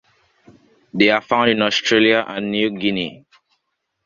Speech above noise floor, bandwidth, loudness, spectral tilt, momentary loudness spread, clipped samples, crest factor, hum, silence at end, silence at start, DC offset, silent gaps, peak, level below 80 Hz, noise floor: 57 dB; 7.4 kHz; -17 LUFS; -4.5 dB/octave; 10 LU; under 0.1%; 18 dB; none; 0.9 s; 0.95 s; under 0.1%; none; 0 dBFS; -58 dBFS; -74 dBFS